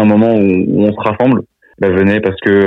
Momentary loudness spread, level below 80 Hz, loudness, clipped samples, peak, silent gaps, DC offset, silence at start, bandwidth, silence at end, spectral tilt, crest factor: 5 LU; -48 dBFS; -12 LUFS; under 0.1%; -2 dBFS; none; under 0.1%; 0 s; 4.2 kHz; 0 s; -9.5 dB/octave; 10 dB